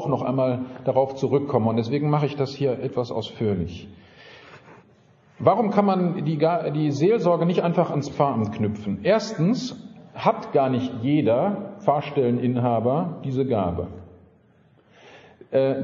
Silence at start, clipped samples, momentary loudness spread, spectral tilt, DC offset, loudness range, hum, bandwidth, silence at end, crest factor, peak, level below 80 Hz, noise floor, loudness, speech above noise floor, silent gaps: 0 s; under 0.1%; 7 LU; -7 dB/octave; under 0.1%; 5 LU; none; 7.4 kHz; 0 s; 20 dB; -2 dBFS; -58 dBFS; -57 dBFS; -23 LUFS; 35 dB; none